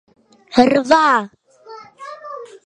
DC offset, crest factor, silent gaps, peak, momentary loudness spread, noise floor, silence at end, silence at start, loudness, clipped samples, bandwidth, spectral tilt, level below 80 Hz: under 0.1%; 18 dB; none; 0 dBFS; 22 LU; -40 dBFS; 0.2 s; 0.5 s; -14 LUFS; under 0.1%; 10 kHz; -4.5 dB/octave; -58 dBFS